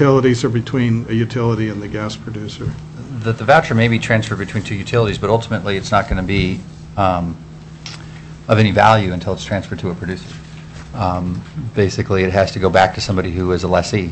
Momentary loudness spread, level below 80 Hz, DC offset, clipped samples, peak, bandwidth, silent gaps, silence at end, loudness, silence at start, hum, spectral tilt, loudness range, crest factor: 18 LU; -36 dBFS; under 0.1%; under 0.1%; 0 dBFS; 8.6 kHz; none; 0 s; -17 LUFS; 0 s; none; -6.5 dB/octave; 3 LU; 18 dB